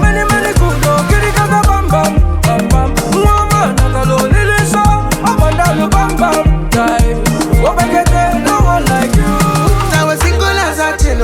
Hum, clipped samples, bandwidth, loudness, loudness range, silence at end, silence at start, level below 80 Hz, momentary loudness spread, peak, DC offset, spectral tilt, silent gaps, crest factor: none; under 0.1%; 17.5 kHz; -11 LUFS; 0 LU; 0 s; 0 s; -16 dBFS; 2 LU; 0 dBFS; under 0.1%; -5.5 dB/octave; none; 10 dB